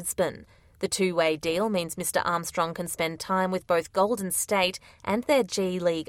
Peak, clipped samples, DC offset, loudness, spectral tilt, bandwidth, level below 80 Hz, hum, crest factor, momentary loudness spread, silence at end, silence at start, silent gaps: -10 dBFS; under 0.1%; under 0.1%; -27 LUFS; -3.5 dB/octave; 16.5 kHz; -60 dBFS; none; 16 dB; 6 LU; 0.05 s; 0 s; none